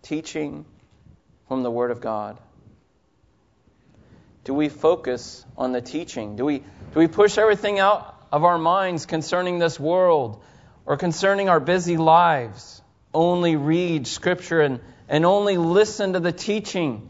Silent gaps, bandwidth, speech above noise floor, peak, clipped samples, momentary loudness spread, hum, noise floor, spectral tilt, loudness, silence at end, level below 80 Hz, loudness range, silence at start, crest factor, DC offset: none; 8 kHz; 41 dB; -4 dBFS; under 0.1%; 13 LU; none; -62 dBFS; -5.5 dB/octave; -21 LUFS; 0 s; -58 dBFS; 10 LU; 0.05 s; 18 dB; under 0.1%